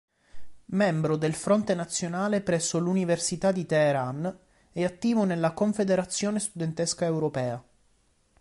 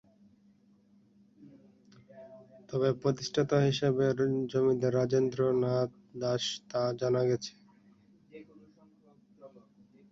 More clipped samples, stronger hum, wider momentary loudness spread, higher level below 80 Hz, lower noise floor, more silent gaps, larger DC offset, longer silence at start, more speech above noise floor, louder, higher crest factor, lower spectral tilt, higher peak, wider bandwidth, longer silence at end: neither; neither; second, 7 LU vs 10 LU; first, -62 dBFS vs -68 dBFS; about the same, -66 dBFS vs -64 dBFS; neither; neither; second, 0.35 s vs 1.4 s; first, 40 dB vs 35 dB; first, -27 LUFS vs -30 LUFS; about the same, 16 dB vs 18 dB; about the same, -5 dB/octave vs -6 dB/octave; first, -10 dBFS vs -14 dBFS; first, 11.5 kHz vs 7.8 kHz; first, 0.8 s vs 0.65 s